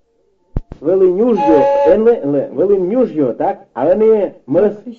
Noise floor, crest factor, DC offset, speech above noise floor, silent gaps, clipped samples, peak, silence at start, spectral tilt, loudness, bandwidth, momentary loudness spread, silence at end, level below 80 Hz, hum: -59 dBFS; 12 dB; under 0.1%; 46 dB; none; under 0.1%; 0 dBFS; 0.55 s; -9 dB/octave; -13 LUFS; 6.6 kHz; 9 LU; 0.05 s; -36 dBFS; none